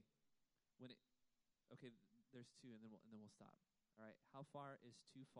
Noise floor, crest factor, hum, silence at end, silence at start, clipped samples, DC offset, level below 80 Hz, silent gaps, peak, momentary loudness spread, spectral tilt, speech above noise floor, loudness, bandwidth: -87 dBFS; 20 dB; none; 0 s; 0 s; under 0.1%; under 0.1%; under -90 dBFS; none; -44 dBFS; 8 LU; -5.5 dB/octave; 25 dB; -63 LUFS; 11 kHz